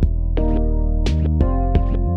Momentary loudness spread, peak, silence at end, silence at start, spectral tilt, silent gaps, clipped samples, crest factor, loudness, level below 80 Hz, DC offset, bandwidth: 3 LU; -2 dBFS; 0 s; 0 s; -8.5 dB/octave; none; under 0.1%; 14 dB; -20 LUFS; -18 dBFS; under 0.1%; 6.8 kHz